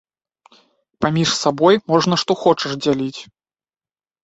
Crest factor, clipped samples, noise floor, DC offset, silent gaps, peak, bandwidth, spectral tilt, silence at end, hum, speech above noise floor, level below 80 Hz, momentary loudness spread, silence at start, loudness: 18 dB; under 0.1%; under -90 dBFS; under 0.1%; none; -2 dBFS; 8.2 kHz; -5 dB/octave; 1 s; none; over 73 dB; -56 dBFS; 8 LU; 1 s; -17 LUFS